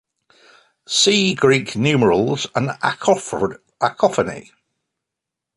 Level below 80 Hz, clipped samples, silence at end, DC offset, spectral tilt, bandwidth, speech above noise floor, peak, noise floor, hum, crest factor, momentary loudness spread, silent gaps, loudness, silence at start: -54 dBFS; under 0.1%; 1.15 s; under 0.1%; -4 dB/octave; 11.5 kHz; 66 dB; -2 dBFS; -84 dBFS; none; 18 dB; 9 LU; none; -18 LUFS; 0.9 s